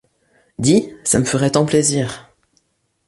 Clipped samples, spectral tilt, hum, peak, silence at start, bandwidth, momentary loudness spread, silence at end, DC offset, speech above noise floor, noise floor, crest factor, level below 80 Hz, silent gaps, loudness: under 0.1%; -4.5 dB/octave; none; -2 dBFS; 0.6 s; 11.5 kHz; 12 LU; 0.85 s; under 0.1%; 48 dB; -64 dBFS; 16 dB; -48 dBFS; none; -17 LUFS